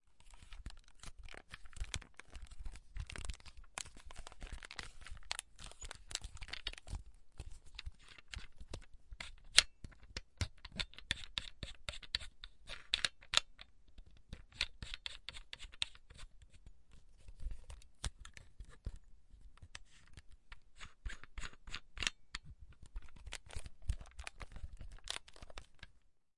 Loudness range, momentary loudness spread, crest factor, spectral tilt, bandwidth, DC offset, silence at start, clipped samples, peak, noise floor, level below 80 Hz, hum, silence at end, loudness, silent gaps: 16 LU; 20 LU; 42 dB; -1 dB/octave; 11.5 kHz; under 0.1%; 0 s; under 0.1%; -4 dBFS; -69 dBFS; -52 dBFS; none; 0 s; -43 LUFS; none